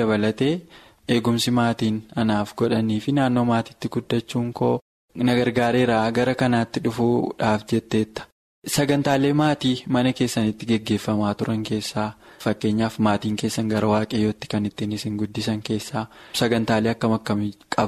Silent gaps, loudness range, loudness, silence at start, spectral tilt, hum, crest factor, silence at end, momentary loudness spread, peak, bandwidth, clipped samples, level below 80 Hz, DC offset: 4.81-5.08 s, 8.32-8.62 s; 3 LU; -23 LUFS; 0 s; -6 dB/octave; none; 16 dB; 0 s; 7 LU; -6 dBFS; 13.5 kHz; under 0.1%; -54 dBFS; under 0.1%